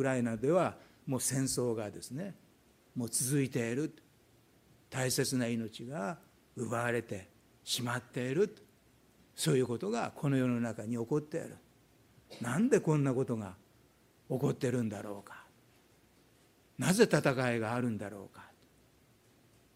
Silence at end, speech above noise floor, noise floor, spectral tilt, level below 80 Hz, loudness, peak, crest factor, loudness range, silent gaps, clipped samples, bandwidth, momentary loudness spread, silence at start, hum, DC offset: 1.3 s; 33 dB; -66 dBFS; -5 dB/octave; -72 dBFS; -34 LUFS; -12 dBFS; 24 dB; 4 LU; none; under 0.1%; 16 kHz; 16 LU; 0 s; none; under 0.1%